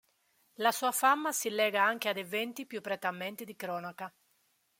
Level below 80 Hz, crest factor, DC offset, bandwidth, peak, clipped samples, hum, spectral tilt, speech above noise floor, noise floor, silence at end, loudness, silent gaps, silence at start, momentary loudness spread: -86 dBFS; 20 dB; under 0.1%; 16.5 kHz; -12 dBFS; under 0.1%; none; -2 dB/octave; 41 dB; -74 dBFS; 0.7 s; -32 LUFS; none; 0.6 s; 13 LU